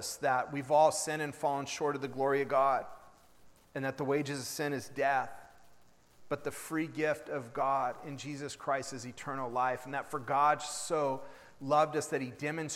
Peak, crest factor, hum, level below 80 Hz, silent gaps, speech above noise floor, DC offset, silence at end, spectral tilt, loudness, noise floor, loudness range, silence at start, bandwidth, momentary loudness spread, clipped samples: -14 dBFS; 20 dB; none; -72 dBFS; none; 31 dB; under 0.1%; 0 s; -4 dB/octave; -33 LUFS; -64 dBFS; 5 LU; 0 s; 16 kHz; 12 LU; under 0.1%